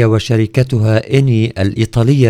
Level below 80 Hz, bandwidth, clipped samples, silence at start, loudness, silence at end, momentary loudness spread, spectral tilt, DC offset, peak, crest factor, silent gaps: -38 dBFS; 11.5 kHz; 0.2%; 0 s; -13 LUFS; 0 s; 3 LU; -7.5 dB/octave; under 0.1%; 0 dBFS; 12 dB; none